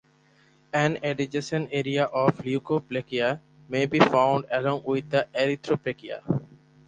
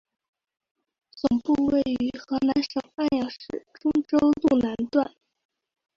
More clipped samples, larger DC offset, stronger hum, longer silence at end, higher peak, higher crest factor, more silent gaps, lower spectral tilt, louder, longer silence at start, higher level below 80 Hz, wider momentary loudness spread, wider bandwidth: neither; neither; neither; second, 0.3 s vs 0.9 s; first, -4 dBFS vs -8 dBFS; about the same, 22 dB vs 18 dB; neither; about the same, -6 dB/octave vs -6.5 dB/octave; about the same, -26 LUFS vs -25 LUFS; second, 0.75 s vs 1.15 s; second, -62 dBFS vs -56 dBFS; about the same, 9 LU vs 9 LU; first, 9.6 kHz vs 7.2 kHz